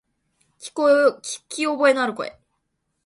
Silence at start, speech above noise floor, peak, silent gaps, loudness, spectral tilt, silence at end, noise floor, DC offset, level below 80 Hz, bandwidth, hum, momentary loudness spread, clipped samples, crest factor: 0.6 s; 54 dB; -4 dBFS; none; -20 LUFS; -2.5 dB/octave; 0.75 s; -75 dBFS; under 0.1%; -72 dBFS; 11.5 kHz; none; 17 LU; under 0.1%; 20 dB